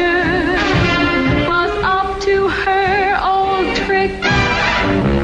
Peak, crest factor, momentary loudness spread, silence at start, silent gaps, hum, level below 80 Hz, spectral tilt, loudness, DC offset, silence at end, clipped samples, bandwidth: -2 dBFS; 12 dB; 2 LU; 0 s; none; none; -30 dBFS; -5.5 dB/octave; -15 LUFS; under 0.1%; 0 s; under 0.1%; 10 kHz